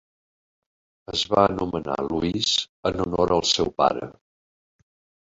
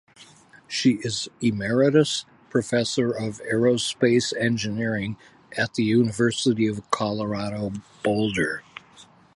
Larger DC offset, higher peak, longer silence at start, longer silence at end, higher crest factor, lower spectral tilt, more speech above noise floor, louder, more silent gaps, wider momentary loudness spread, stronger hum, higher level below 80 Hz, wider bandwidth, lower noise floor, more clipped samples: neither; about the same, -4 dBFS vs -6 dBFS; first, 1.1 s vs 0.2 s; first, 1.2 s vs 0.35 s; about the same, 22 dB vs 18 dB; about the same, -4 dB/octave vs -5 dB/octave; first, over 67 dB vs 29 dB; about the same, -23 LUFS vs -24 LUFS; first, 2.69-2.83 s vs none; about the same, 8 LU vs 10 LU; neither; first, -48 dBFS vs -58 dBFS; second, 8.2 kHz vs 11.5 kHz; first, under -90 dBFS vs -52 dBFS; neither